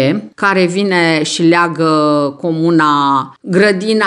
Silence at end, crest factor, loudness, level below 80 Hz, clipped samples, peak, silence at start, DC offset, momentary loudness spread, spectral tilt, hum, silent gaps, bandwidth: 0 s; 12 dB; -12 LUFS; -62 dBFS; under 0.1%; 0 dBFS; 0 s; under 0.1%; 5 LU; -5.5 dB/octave; none; none; 11 kHz